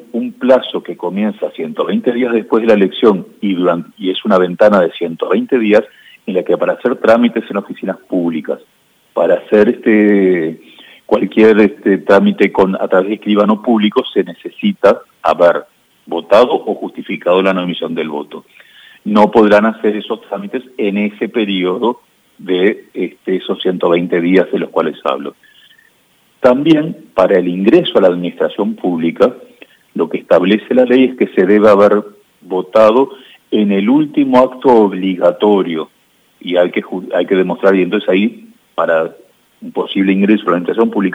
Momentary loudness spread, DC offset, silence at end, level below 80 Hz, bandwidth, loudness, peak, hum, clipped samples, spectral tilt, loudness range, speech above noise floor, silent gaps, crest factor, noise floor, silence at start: 12 LU; under 0.1%; 0 s; -56 dBFS; 9.6 kHz; -13 LUFS; 0 dBFS; none; 0.1%; -7.5 dB/octave; 4 LU; 42 dB; none; 12 dB; -54 dBFS; 0.15 s